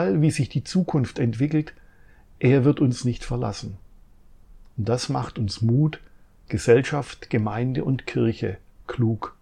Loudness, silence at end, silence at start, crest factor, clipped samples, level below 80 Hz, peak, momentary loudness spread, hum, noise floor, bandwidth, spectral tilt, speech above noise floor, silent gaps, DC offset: -24 LUFS; 0.1 s; 0 s; 18 dB; under 0.1%; -48 dBFS; -6 dBFS; 13 LU; none; -50 dBFS; 11 kHz; -7 dB/octave; 28 dB; none; under 0.1%